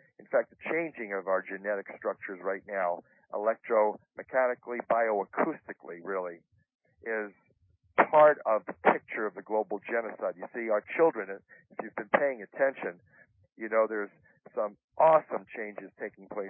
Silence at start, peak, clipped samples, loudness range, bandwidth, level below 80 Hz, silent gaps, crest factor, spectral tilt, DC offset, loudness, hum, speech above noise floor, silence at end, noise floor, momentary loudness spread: 0.3 s; -6 dBFS; under 0.1%; 5 LU; 3.5 kHz; -80 dBFS; 6.75-6.79 s, 14.84-14.88 s; 24 dB; 1 dB/octave; under 0.1%; -30 LUFS; none; 38 dB; 0 s; -68 dBFS; 16 LU